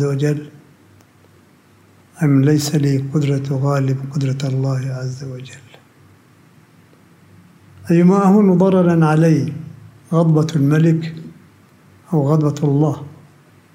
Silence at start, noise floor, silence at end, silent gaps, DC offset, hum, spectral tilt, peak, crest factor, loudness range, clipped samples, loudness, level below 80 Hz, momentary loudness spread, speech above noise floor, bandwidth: 0 s; -50 dBFS; 0.6 s; none; under 0.1%; none; -8 dB/octave; -4 dBFS; 14 dB; 10 LU; under 0.1%; -16 LUFS; -64 dBFS; 17 LU; 35 dB; 16 kHz